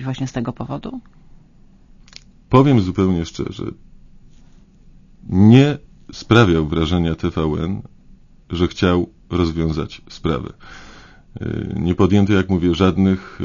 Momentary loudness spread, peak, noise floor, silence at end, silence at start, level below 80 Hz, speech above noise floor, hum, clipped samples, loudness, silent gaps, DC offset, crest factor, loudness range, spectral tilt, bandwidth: 17 LU; 0 dBFS; -47 dBFS; 0 s; 0 s; -38 dBFS; 30 dB; none; under 0.1%; -18 LUFS; none; under 0.1%; 18 dB; 6 LU; -7.5 dB/octave; 7.4 kHz